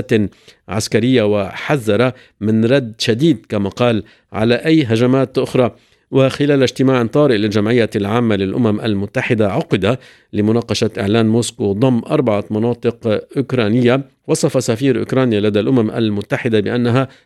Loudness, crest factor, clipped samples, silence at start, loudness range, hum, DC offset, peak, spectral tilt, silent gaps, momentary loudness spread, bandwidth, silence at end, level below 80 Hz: -16 LUFS; 16 dB; under 0.1%; 0 s; 2 LU; none; under 0.1%; 0 dBFS; -6.5 dB/octave; none; 6 LU; 14 kHz; 0.2 s; -54 dBFS